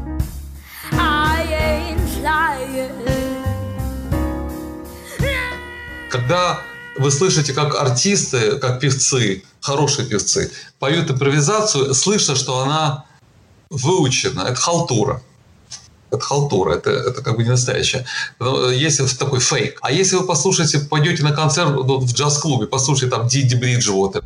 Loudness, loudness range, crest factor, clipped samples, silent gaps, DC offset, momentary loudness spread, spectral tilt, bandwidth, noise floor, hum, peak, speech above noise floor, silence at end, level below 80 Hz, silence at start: -17 LUFS; 6 LU; 14 dB; under 0.1%; none; under 0.1%; 11 LU; -4 dB/octave; 15.5 kHz; -50 dBFS; none; -6 dBFS; 33 dB; 0 s; -34 dBFS; 0 s